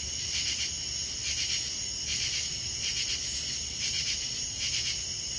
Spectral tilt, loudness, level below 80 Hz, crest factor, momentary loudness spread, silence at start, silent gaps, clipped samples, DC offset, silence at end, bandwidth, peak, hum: 0.5 dB/octave; -29 LUFS; -50 dBFS; 16 dB; 3 LU; 0 s; none; under 0.1%; under 0.1%; 0 s; 8 kHz; -16 dBFS; none